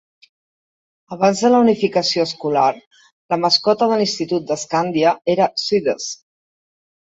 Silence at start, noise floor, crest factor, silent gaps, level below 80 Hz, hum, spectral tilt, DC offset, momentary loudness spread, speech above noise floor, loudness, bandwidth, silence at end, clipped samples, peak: 1.1 s; under -90 dBFS; 16 dB; 2.87-2.91 s, 3.12-3.29 s; -64 dBFS; none; -4 dB/octave; under 0.1%; 10 LU; over 73 dB; -17 LUFS; 8 kHz; 0.9 s; under 0.1%; -2 dBFS